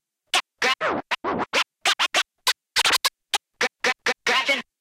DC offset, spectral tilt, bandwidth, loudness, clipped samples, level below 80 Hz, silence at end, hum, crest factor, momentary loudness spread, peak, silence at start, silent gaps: under 0.1%; 0 dB/octave; 17 kHz; -22 LUFS; under 0.1%; -62 dBFS; 0.2 s; none; 18 dB; 7 LU; -8 dBFS; 0.35 s; none